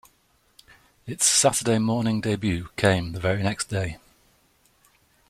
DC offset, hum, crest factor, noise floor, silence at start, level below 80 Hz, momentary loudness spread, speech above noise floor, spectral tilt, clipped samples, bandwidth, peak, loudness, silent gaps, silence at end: under 0.1%; none; 20 dB; -64 dBFS; 1.05 s; -52 dBFS; 14 LU; 41 dB; -4 dB/octave; under 0.1%; 15 kHz; -6 dBFS; -23 LUFS; none; 1.35 s